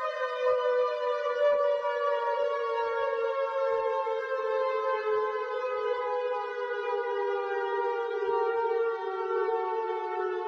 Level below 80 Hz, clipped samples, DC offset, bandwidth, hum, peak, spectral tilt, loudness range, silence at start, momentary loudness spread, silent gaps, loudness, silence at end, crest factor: -78 dBFS; under 0.1%; under 0.1%; 6.8 kHz; none; -16 dBFS; -3.5 dB/octave; 2 LU; 0 s; 5 LU; none; -29 LUFS; 0 s; 14 dB